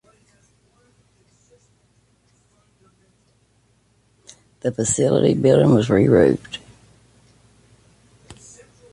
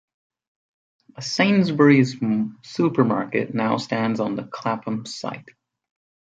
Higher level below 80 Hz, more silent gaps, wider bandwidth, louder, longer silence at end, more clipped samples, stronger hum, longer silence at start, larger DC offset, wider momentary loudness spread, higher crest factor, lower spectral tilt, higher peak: first, -50 dBFS vs -66 dBFS; neither; first, 11.5 kHz vs 9 kHz; first, -17 LUFS vs -21 LUFS; second, 0.6 s vs 0.9 s; neither; neither; first, 4.65 s vs 1.2 s; neither; first, 19 LU vs 14 LU; about the same, 20 dB vs 20 dB; about the same, -6 dB/octave vs -6 dB/octave; about the same, -2 dBFS vs -4 dBFS